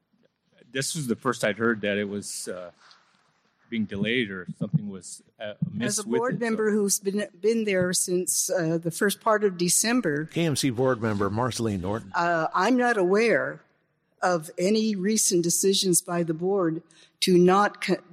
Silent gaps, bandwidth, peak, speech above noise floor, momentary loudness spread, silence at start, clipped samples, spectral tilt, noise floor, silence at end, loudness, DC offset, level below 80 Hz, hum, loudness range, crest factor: none; 14.5 kHz; -8 dBFS; 45 dB; 11 LU; 0.75 s; under 0.1%; -4 dB/octave; -70 dBFS; 0.15 s; -25 LUFS; under 0.1%; -64 dBFS; none; 6 LU; 16 dB